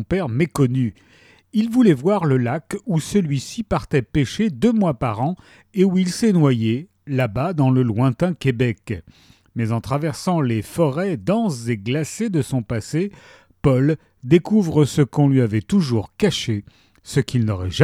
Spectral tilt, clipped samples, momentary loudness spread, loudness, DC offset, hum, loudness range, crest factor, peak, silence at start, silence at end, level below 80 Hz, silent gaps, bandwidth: -7 dB/octave; under 0.1%; 9 LU; -20 LUFS; under 0.1%; none; 3 LU; 18 dB; 0 dBFS; 0 s; 0 s; -46 dBFS; none; 14.5 kHz